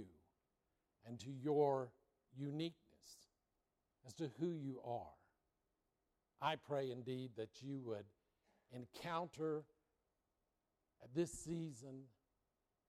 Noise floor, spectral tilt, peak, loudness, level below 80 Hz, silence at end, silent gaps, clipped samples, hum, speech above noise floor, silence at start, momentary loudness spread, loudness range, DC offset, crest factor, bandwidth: -89 dBFS; -6 dB/octave; -26 dBFS; -46 LUFS; -80 dBFS; 0.8 s; none; under 0.1%; none; 44 dB; 0 s; 21 LU; 6 LU; under 0.1%; 22 dB; 14 kHz